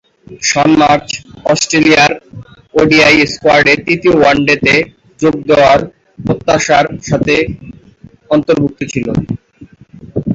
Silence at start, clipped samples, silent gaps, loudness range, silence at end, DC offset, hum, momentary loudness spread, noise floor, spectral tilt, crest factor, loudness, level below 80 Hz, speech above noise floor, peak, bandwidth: 0.3 s; under 0.1%; none; 5 LU; 0 s; under 0.1%; none; 14 LU; -40 dBFS; -4.5 dB/octave; 12 dB; -10 LUFS; -38 dBFS; 30 dB; 0 dBFS; 8 kHz